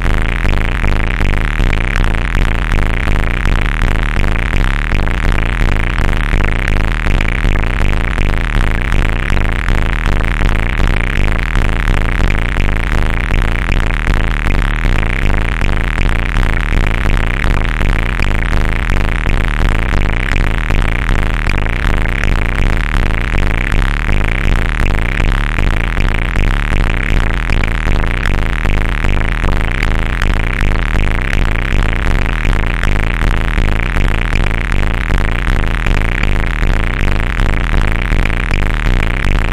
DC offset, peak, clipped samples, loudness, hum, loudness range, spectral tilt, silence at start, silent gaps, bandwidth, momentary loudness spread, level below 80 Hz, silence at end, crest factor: under 0.1%; 0 dBFS; under 0.1%; -16 LUFS; none; 0 LU; -6 dB/octave; 0 s; none; 11 kHz; 1 LU; -12 dBFS; 0 s; 12 dB